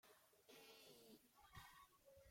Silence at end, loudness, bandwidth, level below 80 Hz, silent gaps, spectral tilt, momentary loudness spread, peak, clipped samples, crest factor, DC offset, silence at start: 0 s; -66 LUFS; 16.5 kHz; -82 dBFS; none; -3 dB/octave; 5 LU; -46 dBFS; under 0.1%; 20 dB; under 0.1%; 0.05 s